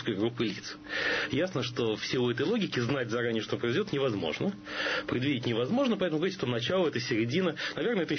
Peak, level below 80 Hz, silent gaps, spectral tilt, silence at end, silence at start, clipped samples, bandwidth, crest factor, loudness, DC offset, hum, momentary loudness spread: -16 dBFS; -62 dBFS; none; -5.5 dB/octave; 0 s; 0 s; under 0.1%; 6.6 kHz; 14 dB; -30 LUFS; under 0.1%; none; 4 LU